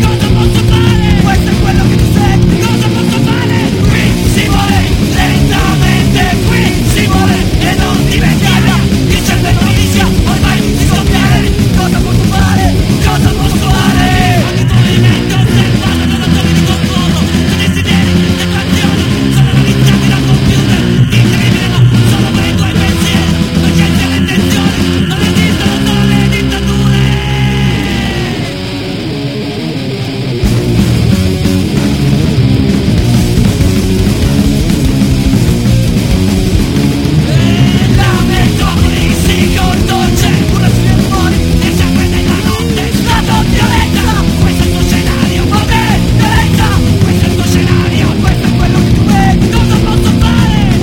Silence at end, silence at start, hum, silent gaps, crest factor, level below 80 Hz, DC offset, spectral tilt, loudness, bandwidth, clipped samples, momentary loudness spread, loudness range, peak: 0 s; 0 s; none; none; 8 dB; -18 dBFS; under 0.1%; -5.5 dB/octave; -9 LUFS; 17 kHz; 0.6%; 3 LU; 1 LU; 0 dBFS